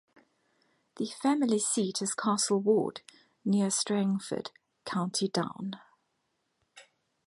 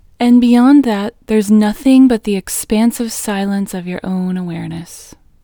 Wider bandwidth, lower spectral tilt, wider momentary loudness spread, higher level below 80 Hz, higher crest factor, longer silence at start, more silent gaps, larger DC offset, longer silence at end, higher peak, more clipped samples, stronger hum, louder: second, 11.5 kHz vs 20 kHz; second, -4 dB/octave vs -5.5 dB/octave; about the same, 13 LU vs 14 LU; second, -78 dBFS vs -44 dBFS; first, 18 dB vs 12 dB; first, 0.95 s vs 0.2 s; neither; neither; about the same, 0.45 s vs 0.4 s; second, -14 dBFS vs 0 dBFS; neither; neither; second, -30 LUFS vs -13 LUFS